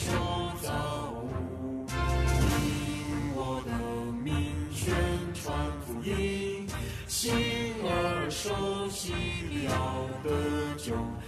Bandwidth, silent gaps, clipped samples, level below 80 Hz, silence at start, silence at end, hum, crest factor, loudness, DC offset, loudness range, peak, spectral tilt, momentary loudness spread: 14 kHz; none; under 0.1%; -40 dBFS; 0 s; 0 s; none; 16 dB; -32 LUFS; under 0.1%; 2 LU; -14 dBFS; -5 dB/octave; 7 LU